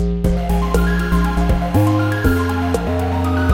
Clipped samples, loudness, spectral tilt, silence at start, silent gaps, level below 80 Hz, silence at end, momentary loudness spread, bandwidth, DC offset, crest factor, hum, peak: under 0.1%; -17 LUFS; -7 dB/octave; 0 s; none; -22 dBFS; 0 s; 3 LU; 16.5 kHz; under 0.1%; 14 dB; none; -2 dBFS